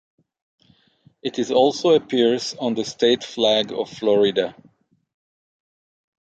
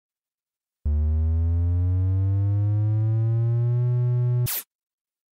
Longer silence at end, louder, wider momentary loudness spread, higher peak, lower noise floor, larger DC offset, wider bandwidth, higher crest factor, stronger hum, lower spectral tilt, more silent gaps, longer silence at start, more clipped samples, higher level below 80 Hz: first, 1.7 s vs 0.7 s; first, -20 LUFS vs -24 LUFS; first, 9 LU vs 3 LU; first, -4 dBFS vs -16 dBFS; second, -58 dBFS vs under -90 dBFS; neither; second, 8.8 kHz vs 15.5 kHz; first, 18 dB vs 8 dB; neither; second, -4 dB/octave vs -7 dB/octave; neither; first, 1.25 s vs 0.85 s; neither; second, -66 dBFS vs -32 dBFS